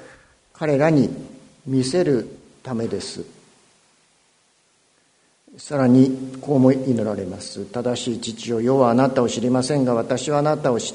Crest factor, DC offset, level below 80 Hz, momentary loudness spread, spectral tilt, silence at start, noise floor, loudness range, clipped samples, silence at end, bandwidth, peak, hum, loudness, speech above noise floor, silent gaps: 20 dB; under 0.1%; -58 dBFS; 15 LU; -6 dB/octave; 0 s; -61 dBFS; 9 LU; under 0.1%; 0 s; 10.5 kHz; -2 dBFS; none; -20 LUFS; 42 dB; none